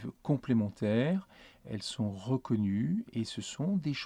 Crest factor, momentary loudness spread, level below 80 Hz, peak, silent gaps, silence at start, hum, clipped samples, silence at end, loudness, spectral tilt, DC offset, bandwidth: 16 dB; 8 LU; -66 dBFS; -18 dBFS; none; 0 s; none; under 0.1%; 0 s; -33 LUFS; -6.5 dB/octave; under 0.1%; 11 kHz